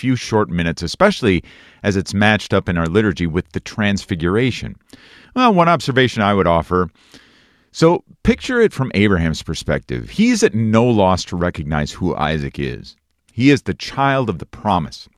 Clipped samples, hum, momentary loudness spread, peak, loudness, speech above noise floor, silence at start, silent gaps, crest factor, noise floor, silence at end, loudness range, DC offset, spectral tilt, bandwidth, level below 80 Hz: under 0.1%; none; 10 LU; 0 dBFS; -17 LUFS; 36 dB; 0 s; none; 18 dB; -53 dBFS; 0.15 s; 3 LU; under 0.1%; -6 dB/octave; 13.5 kHz; -38 dBFS